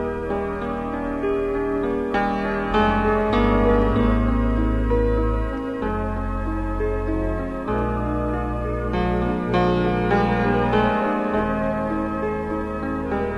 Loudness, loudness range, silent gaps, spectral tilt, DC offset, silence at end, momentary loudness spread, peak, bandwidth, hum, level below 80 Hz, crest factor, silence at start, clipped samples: -22 LUFS; 5 LU; none; -8.5 dB/octave; under 0.1%; 0 s; 7 LU; -6 dBFS; 6.8 kHz; none; -28 dBFS; 16 dB; 0 s; under 0.1%